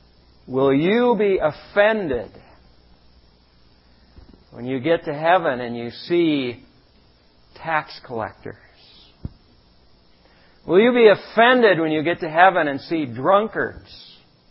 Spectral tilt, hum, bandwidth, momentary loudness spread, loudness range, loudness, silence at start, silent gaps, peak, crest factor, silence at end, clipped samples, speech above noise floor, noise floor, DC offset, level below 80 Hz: -10.5 dB/octave; none; 5.8 kHz; 22 LU; 15 LU; -19 LUFS; 0.5 s; none; 0 dBFS; 22 dB; 0.5 s; under 0.1%; 36 dB; -55 dBFS; under 0.1%; -52 dBFS